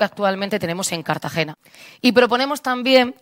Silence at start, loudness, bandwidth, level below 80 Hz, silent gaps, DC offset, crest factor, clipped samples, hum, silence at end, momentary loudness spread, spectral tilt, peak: 0 s; -19 LUFS; 16.5 kHz; -64 dBFS; none; under 0.1%; 20 dB; under 0.1%; none; 0.1 s; 8 LU; -4 dB/octave; 0 dBFS